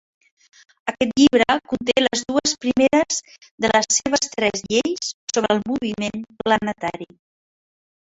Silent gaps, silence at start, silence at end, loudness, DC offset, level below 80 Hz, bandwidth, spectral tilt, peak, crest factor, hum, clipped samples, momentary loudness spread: 3.51-3.58 s, 5.14-5.27 s; 0.85 s; 1.15 s; -20 LUFS; under 0.1%; -54 dBFS; 8 kHz; -2.5 dB/octave; -2 dBFS; 20 dB; none; under 0.1%; 11 LU